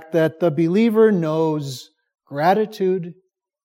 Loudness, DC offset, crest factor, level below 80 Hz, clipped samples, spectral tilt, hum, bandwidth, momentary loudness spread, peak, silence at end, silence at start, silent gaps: -19 LUFS; under 0.1%; 16 dB; -72 dBFS; under 0.1%; -7.5 dB/octave; none; 16.5 kHz; 16 LU; -4 dBFS; 0.5 s; 0 s; none